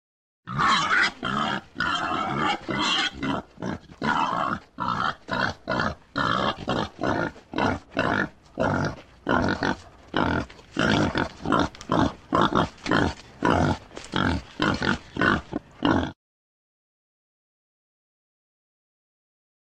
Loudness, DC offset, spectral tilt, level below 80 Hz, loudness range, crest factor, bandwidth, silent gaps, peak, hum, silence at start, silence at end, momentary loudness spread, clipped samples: -25 LUFS; under 0.1%; -5 dB/octave; -46 dBFS; 3 LU; 22 dB; 10 kHz; none; -6 dBFS; none; 0.45 s; 3.55 s; 8 LU; under 0.1%